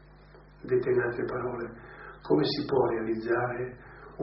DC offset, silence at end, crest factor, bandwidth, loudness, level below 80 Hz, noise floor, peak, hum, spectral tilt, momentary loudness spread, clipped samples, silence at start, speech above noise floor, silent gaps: under 0.1%; 0 s; 18 dB; 5.8 kHz; -29 LUFS; -56 dBFS; -53 dBFS; -12 dBFS; 50 Hz at -50 dBFS; -5 dB/octave; 19 LU; under 0.1%; 0.1 s; 24 dB; none